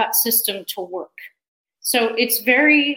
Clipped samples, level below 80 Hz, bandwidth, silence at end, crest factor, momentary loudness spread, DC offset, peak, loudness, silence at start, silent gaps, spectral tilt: under 0.1%; -72 dBFS; 17 kHz; 0 s; 18 dB; 17 LU; under 0.1%; -2 dBFS; -17 LUFS; 0 s; 1.48-1.65 s; -1 dB/octave